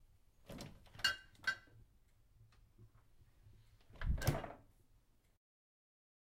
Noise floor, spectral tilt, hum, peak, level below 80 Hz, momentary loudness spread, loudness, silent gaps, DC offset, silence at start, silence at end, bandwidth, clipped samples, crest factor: -71 dBFS; -3.5 dB/octave; none; -20 dBFS; -52 dBFS; 17 LU; -42 LUFS; none; under 0.1%; 0.5 s; 1.75 s; 16 kHz; under 0.1%; 26 dB